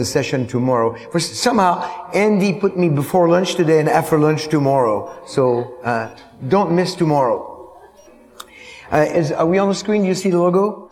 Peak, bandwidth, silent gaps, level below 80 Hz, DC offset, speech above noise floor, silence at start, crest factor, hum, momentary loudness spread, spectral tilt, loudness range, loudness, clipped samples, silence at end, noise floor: 0 dBFS; 17 kHz; none; -54 dBFS; under 0.1%; 29 dB; 0 s; 16 dB; none; 8 LU; -6 dB/octave; 4 LU; -17 LUFS; under 0.1%; 0.05 s; -46 dBFS